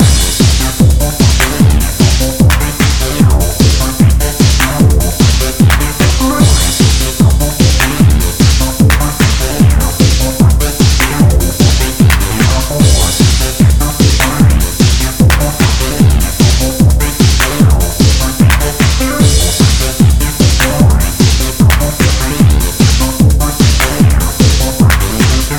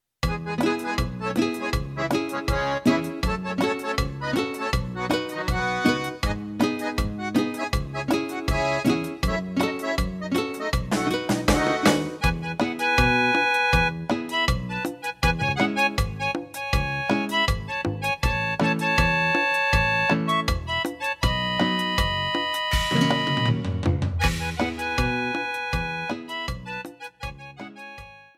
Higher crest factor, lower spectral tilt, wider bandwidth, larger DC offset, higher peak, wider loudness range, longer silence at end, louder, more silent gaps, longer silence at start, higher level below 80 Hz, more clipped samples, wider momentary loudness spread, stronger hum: second, 8 dB vs 20 dB; about the same, -4.5 dB/octave vs -5 dB/octave; first, 18 kHz vs 16 kHz; first, 3% vs under 0.1%; first, 0 dBFS vs -4 dBFS; second, 1 LU vs 4 LU; second, 0 s vs 0.15 s; first, -10 LUFS vs -24 LUFS; neither; second, 0 s vs 0.25 s; first, -12 dBFS vs -34 dBFS; neither; second, 1 LU vs 8 LU; neither